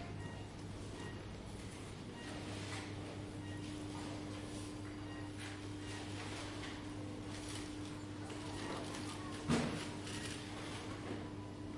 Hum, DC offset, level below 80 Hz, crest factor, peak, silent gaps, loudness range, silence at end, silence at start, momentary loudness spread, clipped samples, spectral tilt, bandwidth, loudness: none; under 0.1%; -60 dBFS; 22 dB; -22 dBFS; none; 4 LU; 0 s; 0 s; 5 LU; under 0.1%; -5 dB/octave; 11.5 kHz; -45 LUFS